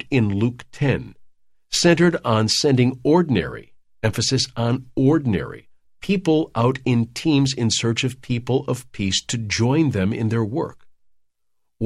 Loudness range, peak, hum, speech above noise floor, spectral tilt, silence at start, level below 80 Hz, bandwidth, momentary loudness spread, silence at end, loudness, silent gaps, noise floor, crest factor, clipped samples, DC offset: 3 LU; -4 dBFS; none; 52 dB; -5 dB/octave; 0.05 s; -48 dBFS; 13 kHz; 9 LU; 0 s; -20 LUFS; none; -71 dBFS; 18 dB; under 0.1%; under 0.1%